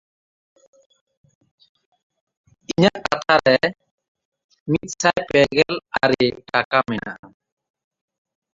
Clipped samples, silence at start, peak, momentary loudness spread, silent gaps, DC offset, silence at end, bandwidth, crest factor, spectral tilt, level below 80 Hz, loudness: under 0.1%; 2.7 s; -2 dBFS; 11 LU; 3.91-3.98 s, 4.08-4.15 s, 4.25-4.32 s, 4.44-4.49 s, 4.60-4.66 s, 6.65-6.71 s, 7.19-7.23 s; under 0.1%; 1.3 s; 7.8 kHz; 22 dB; -4.5 dB/octave; -54 dBFS; -19 LUFS